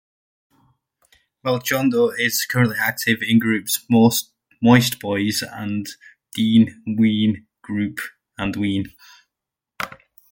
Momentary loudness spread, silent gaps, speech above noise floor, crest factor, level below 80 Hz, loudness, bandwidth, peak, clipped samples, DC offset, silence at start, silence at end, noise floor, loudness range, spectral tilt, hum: 16 LU; none; 66 dB; 18 dB; -56 dBFS; -19 LUFS; 17 kHz; -2 dBFS; under 0.1%; under 0.1%; 1.45 s; 0.35 s; -85 dBFS; 5 LU; -5 dB/octave; none